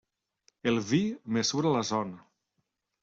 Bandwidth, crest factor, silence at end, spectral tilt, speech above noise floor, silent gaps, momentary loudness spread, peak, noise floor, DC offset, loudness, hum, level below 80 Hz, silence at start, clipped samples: 7.8 kHz; 18 dB; 0.8 s; -4.5 dB/octave; 52 dB; none; 6 LU; -14 dBFS; -80 dBFS; under 0.1%; -29 LUFS; none; -68 dBFS; 0.65 s; under 0.1%